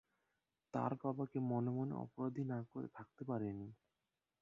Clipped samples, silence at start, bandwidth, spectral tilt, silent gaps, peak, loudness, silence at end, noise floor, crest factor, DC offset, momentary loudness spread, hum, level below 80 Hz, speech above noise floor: under 0.1%; 0.75 s; 7.2 kHz; -10.5 dB/octave; none; -26 dBFS; -43 LUFS; 0.65 s; under -90 dBFS; 18 dB; under 0.1%; 11 LU; none; -78 dBFS; over 48 dB